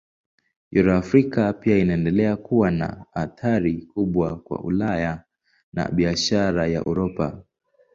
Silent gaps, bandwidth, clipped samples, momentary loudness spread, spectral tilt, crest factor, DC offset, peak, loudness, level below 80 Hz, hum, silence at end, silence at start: 5.63-5.72 s; 7.6 kHz; under 0.1%; 10 LU; -6.5 dB/octave; 18 dB; under 0.1%; -4 dBFS; -22 LUFS; -44 dBFS; none; 0.55 s; 0.7 s